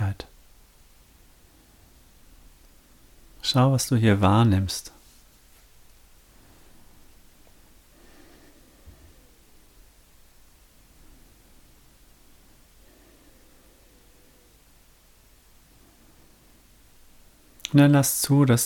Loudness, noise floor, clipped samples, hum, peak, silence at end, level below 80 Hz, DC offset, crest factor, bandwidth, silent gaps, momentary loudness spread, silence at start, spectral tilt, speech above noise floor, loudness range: -21 LUFS; -56 dBFS; under 0.1%; none; -4 dBFS; 0 s; -54 dBFS; under 0.1%; 24 dB; 18.5 kHz; none; 20 LU; 0 s; -5.5 dB/octave; 37 dB; 13 LU